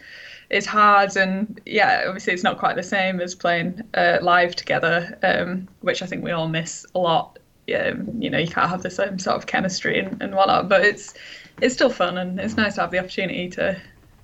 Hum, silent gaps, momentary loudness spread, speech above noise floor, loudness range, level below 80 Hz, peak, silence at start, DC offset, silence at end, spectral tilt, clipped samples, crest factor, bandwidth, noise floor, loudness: none; none; 10 LU; 21 dB; 4 LU; -56 dBFS; -6 dBFS; 0.05 s; under 0.1%; 0.4 s; -4.5 dB/octave; under 0.1%; 16 dB; 8.4 kHz; -42 dBFS; -21 LUFS